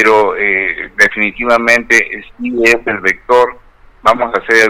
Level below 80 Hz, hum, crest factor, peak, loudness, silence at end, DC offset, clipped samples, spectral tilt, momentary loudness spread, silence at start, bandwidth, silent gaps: -42 dBFS; none; 12 dB; 0 dBFS; -11 LUFS; 0 s; under 0.1%; 0.4%; -3 dB/octave; 7 LU; 0 s; 17 kHz; none